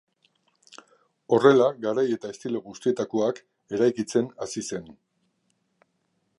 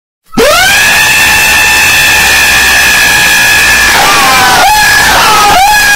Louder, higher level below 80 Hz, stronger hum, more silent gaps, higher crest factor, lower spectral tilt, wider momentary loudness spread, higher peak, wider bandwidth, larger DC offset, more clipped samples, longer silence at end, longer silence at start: second, -25 LUFS vs -3 LUFS; second, -70 dBFS vs -26 dBFS; neither; neither; first, 22 dB vs 4 dB; first, -5.5 dB/octave vs -0.5 dB/octave; first, 15 LU vs 1 LU; second, -4 dBFS vs 0 dBFS; second, 11.5 kHz vs over 20 kHz; neither; second, under 0.1% vs 5%; first, 1.45 s vs 0 s; first, 1.3 s vs 0.3 s